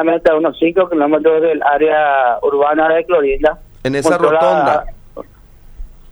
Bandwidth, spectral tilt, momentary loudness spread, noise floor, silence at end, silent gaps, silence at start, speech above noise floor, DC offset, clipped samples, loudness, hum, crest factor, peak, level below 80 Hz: over 20 kHz; -5.5 dB/octave; 5 LU; -40 dBFS; 0.2 s; none; 0 s; 27 dB; under 0.1%; under 0.1%; -13 LUFS; none; 14 dB; 0 dBFS; -36 dBFS